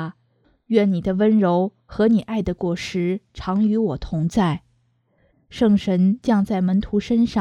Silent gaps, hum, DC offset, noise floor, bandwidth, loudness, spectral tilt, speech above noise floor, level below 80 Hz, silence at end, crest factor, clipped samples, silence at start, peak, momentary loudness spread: none; none; under 0.1%; -64 dBFS; 9.4 kHz; -20 LUFS; -8 dB/octave; 45 dB; -44 dBFS; 0 s; 16 dB; under 0.1%; 0 s; -4 dBFS; 8 LU